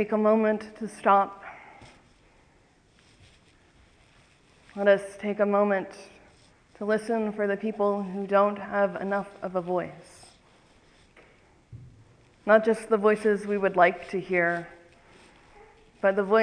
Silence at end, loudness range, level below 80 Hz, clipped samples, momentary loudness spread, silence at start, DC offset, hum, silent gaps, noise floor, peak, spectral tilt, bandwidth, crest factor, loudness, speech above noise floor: 0 s; 7 LU; -64 dBFS; under 0.1%; 15 LU; 0 s; under 0.1%; none; none; -61 dBFS; -6 dBFS; -6.5 dB/octave; 10.5 kHz; 22 dB; -26 LUFS; 36 dB